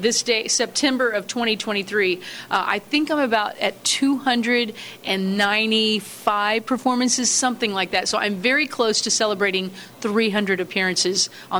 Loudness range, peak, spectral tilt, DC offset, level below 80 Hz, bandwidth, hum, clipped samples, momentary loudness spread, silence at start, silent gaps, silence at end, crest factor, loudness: 2 LU; -6 dBFS; -2 dB/octave; under 0.1%; -66 dBFS; over 20 kHz; none; under 0.1%; 5 LU; 0 s; none; 0 s; 16 dB; -20 LUFS